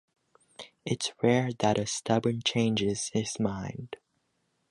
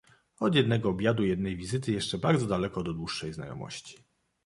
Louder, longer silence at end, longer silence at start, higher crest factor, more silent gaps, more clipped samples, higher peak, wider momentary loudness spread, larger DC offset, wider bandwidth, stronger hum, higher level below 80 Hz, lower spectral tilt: about the same, -29 LUFS vs -29 LUFS; first, 0.75 s vs 0.5 s; first, 0.6 s vs 0.4 s; about the same, 20 dB vs 20 dB; neither; neither; about the same, -10 dBFS vs -10 dBFS; first, 17 LU vs 14 LU; neither; about the same, 11.5 kHz vs 11.5 kHz; neither; second, -60 dBFS vs -54 dBFS; second, -4.5 dB/octave vs -6 dB/octave